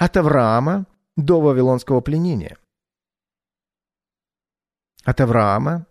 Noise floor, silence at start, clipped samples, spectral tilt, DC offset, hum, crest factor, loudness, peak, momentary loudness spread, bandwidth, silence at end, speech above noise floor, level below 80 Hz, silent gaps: under -90 dBFS; 0 s; under 0.1%; -8.5 dB/octave; under 0.1%; none; 16 dB; -18 LUFS; -2 dBFS; 11 LU; 13 kHz; 0.05 s; over 73 dB; -42 dBFS; none